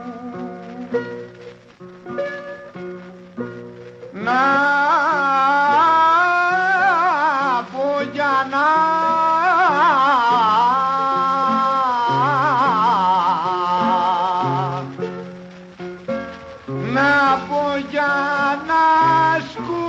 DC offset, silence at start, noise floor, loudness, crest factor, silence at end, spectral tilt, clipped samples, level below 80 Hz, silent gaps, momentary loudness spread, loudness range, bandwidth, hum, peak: under 0.1%; 0 s; -41 dBFS; -17 LUFS; 12 dB; 0 s; -5.5 dB/octave; under 0.1%; -58 dBFS; none; 19 LU; 8 LU; 8 kHz; none; -6 dBFS